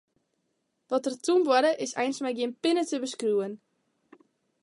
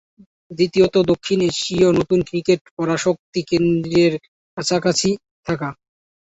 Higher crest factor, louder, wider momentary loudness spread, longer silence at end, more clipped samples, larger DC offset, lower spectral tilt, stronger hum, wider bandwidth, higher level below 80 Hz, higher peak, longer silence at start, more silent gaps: about the same, 18 dB vs 16 dB; second, -27 LUFS vs -19 LUFS; about the same, 8 LU vs 10 LU; first, 1.05 s vs 0.5 s; neither; neither; second, -3.5 dB/octave vs -5 dB/octave; neither; first, 11.5 kHz vs 8.2 kHz; second, -84 dBFS vs -50 dBFS; second, -10 dBFS vs -2 dBFS; first, 0.9 s vs 0.5 s; second, none vs 2.61-2.65 s, 2.71-2.77 s, 3.19-3.33 s, 4.28-4.57 s, 5.31-5.43 s